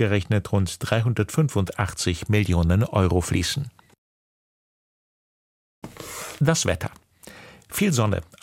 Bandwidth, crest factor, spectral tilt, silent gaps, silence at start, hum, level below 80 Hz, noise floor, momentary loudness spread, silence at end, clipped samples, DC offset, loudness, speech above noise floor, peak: 16.5 kHz; 20 dB; -5.5 dB/octave; 3.98-5.82 s; 0 s; none; -42 dBFS; -46 dBFS; 14 LU; 0.2 s; under 0.1%; under 0.1%; -23 LUFS; 24 dB; -4 dBFS